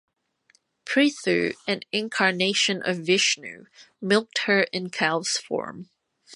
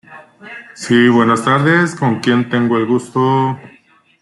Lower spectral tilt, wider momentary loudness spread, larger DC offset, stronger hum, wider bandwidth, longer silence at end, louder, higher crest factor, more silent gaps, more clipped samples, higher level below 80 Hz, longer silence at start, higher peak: second, -3 dB/octave vs -6 dB/octave; second, 10 LU vs 18 LU; neither; neither; about the same, 11.5 kHz vs 11.5 kHz; second, 0 s vs 0.55 s; second, -23 LUFS vs -14 LUFS; first, 20 dB vs 14 dB; neither; neither; second, -72 dBFS vs -58 dBFS; first, 0.85 s vs 0.1 s; second, -6 dBFS vs -2 dBFS